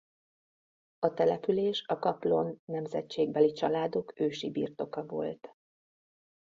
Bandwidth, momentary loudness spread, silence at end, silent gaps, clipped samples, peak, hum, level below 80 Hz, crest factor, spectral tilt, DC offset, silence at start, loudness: 7.6 kHz; 9 LU; 1.1 s; 2.59-2.67 s; under 0.1%; -12 dBFS; none; -74 dBFS; 20 dB; -6.5 dB/octave; under 0.1%; 1 s; -31 LUFS